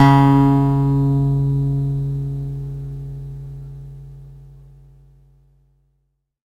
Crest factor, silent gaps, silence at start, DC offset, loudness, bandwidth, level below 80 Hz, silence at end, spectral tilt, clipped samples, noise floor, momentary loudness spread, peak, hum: 18 dB; none; 0 s; under 0.1%; -18 LUFS; 5.8 kHz; -38 dBFS; 2 s; -9 dB/octave; under 0.1%; -69 dBFS; 23 LU; 0 dBFS; none